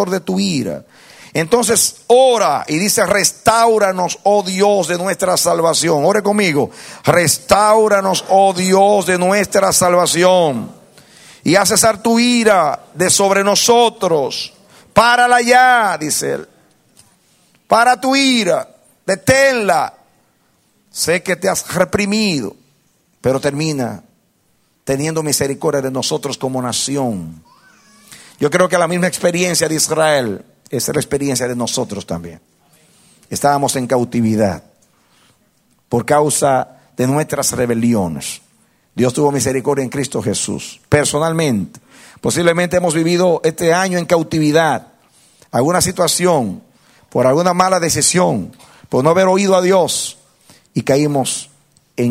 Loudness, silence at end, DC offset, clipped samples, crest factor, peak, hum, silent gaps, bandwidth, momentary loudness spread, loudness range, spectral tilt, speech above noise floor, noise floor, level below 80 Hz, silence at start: -14 LUFS; 0 s; under 0.1%; under 0.1%; 16 dB; 0 dBFS; none; none; 16.5 kHz; 12 LU; 6 LU; -3.5 dB/octave; 45 dB; -59 dBFS; -50 dBFS; 0 s